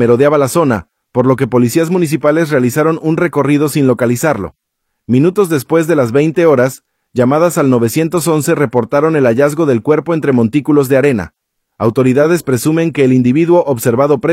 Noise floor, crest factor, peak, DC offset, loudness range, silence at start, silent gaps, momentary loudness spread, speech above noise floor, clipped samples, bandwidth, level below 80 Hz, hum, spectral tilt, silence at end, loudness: -70 dBFS; 12 dB; 0 dBFS; under 0.1%; 1 LU; 0 s; none; 5 LU; 59 dB; under 0.1%; 16.5 kHz; -50 dBFS; none; -6.5 dB/octave; 0 s; -12 LUFS